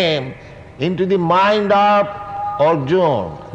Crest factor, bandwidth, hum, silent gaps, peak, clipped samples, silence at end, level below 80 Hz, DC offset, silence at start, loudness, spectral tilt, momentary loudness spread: 12 dB; 8.4 kHz; none; none; -4 dBFS; under 0.1%; 0 s; -50 dBFS; under 0.1%; 0 s; -16 LUFS; -7 dB/octave; 11 LU